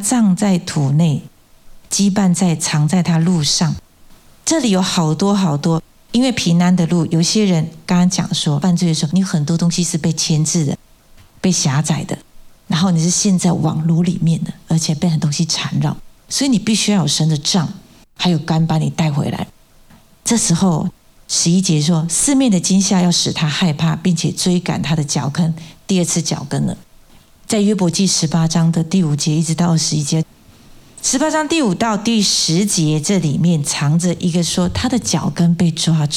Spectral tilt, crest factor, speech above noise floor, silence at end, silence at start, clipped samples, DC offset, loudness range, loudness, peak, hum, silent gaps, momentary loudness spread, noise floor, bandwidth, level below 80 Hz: -4.5 dB/octave; 12 dB; 31 dB; 0 s; 0 s; under 0.1%; under 0.1%; 3 LU; -16 LUFS; -4 dBFS; none; none; 7 LU; -46 dBFS; 14 kHz; -46 dBFS